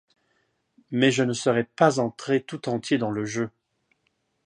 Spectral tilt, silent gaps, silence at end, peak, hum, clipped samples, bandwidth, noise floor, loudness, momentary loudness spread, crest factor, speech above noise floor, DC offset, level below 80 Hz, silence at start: -5 dB/octave; none; 0.95 s; -4 dBFS; none; under 0.1%; 10.5 kHz; -73 dBFS; -25 LUFS; 9 LU; 22 dB; 49 dB; under 0.1%; -68 dBFS; 0.9 s